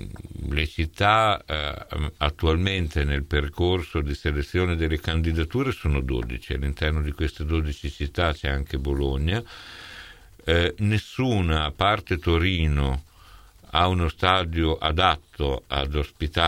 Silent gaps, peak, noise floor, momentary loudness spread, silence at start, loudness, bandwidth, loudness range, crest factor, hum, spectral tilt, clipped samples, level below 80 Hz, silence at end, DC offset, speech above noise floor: none; -2 dBFS; -49 dBFS; 9 LU; 0 s; -25 LUFS; 14 kHz; 3 LU; 22 dB; none; -6.5 dB/octave; under 0.1%; -30 dBFS; 0 s; under 0.1%; 25 dB